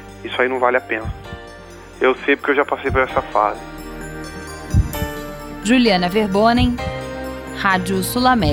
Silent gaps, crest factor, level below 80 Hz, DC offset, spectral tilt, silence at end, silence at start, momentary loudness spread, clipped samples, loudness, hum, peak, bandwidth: none; 18 dB; -32 dBFS; under 0.1%; -5.5 dB/octave; 0 s; 0 s; 16 LU; under 0.1%; -18 LUFS; none; 0 dBFS; 17.5 kHz